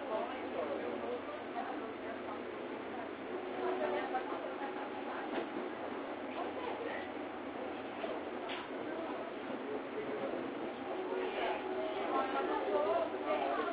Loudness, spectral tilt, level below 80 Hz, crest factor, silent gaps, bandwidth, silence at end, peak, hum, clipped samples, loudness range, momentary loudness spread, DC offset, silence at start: -39 LUFS; -2.5 dB/octave; -74 dBFS; 18 dB; none; 4 kHz; 0 s; -22 dBFS; none; under 0.1%; 5 LU; 8 LU; under 0.1%; 0 s